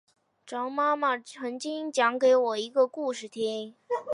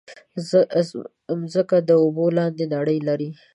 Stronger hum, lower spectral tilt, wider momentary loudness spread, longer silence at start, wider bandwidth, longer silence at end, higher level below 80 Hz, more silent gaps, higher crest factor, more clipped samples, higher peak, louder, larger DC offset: neither; second, -3 dB/octave vs -7.5 dB/octave; about the same, 12 LU vs 12 LU; first, 0.45 s vs 0.1 s; about the same, 11 kHz vs 11 kHz; second, 0 s vs 0.2 s; second, -86 dBFS vs -72 dBFS; neither; about the same, 18 dB vs 16 dB; neither; second, -10 dBFS vs -6 dBFS; second, -28 LUFS vs -21 LUFS; neither